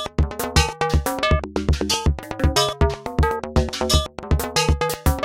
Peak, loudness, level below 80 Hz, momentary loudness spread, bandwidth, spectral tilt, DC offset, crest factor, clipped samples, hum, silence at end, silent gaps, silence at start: -2 dBFS; -21 LUFS; -26 dBFS; 4 LU; 17 kHz; -4.5 dB/octave; under 0.1%; 18 dB; under 0.1%; none; 0 s; none; 0 s